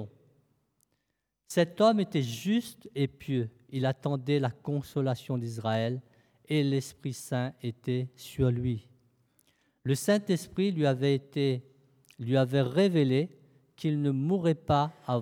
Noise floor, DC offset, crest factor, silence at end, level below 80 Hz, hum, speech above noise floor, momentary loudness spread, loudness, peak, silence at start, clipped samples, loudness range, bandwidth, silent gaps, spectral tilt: -82 dBFS; under 0.1%; 18 dB; 0 s; -62 dBFS; none; 53 dB; 11 LU; -30 LUFS; -12 dBFS; 0 s; under 0.1%; 4 LU; 17 kHz; none; -6.5 dB/octave